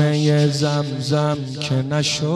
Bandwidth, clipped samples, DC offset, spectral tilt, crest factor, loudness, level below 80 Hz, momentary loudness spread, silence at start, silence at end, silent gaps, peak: 12 kHz; under 0.1%; under 0.1%; -5.5 dB/octave; 12 dB; -20 LUFS; -56 dBFS; 6 LU; 0 s; 0 s; none; -6 dBFS